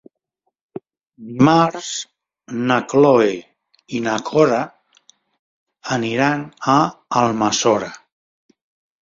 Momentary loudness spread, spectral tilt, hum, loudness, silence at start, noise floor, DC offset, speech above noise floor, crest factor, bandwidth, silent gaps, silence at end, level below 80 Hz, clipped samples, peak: 20 LU; -5 dB/octave; none; -18 LUFS; 1.2 s; -74 dBFS; under 0.1%; 57 dB; 18 dB; 7.8 kHz; 5.39-5.67 s; 1.05 s; -60 dBFS; under 0.1%; -2 dBFS